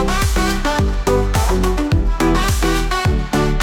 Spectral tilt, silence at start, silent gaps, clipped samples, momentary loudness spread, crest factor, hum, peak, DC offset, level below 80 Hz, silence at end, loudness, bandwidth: -5 dB/octave; 0 s; none; under 0.1%; 2 LU; 12 dB; none; -4 dBFS; under 0.1%; -20 dBFS; 0 s; -17 LUFS; 18 kHz